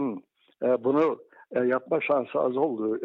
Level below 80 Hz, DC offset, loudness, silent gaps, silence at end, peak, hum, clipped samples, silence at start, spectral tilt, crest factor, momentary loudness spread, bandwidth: -78 dBFS; under 0.1%; -26 LUFS; none; 0 s; -14 dBFS; none; under 0.1%; 0 s; -8.5 dB/octave; 14 dB; 9 LU; 5.2 kHz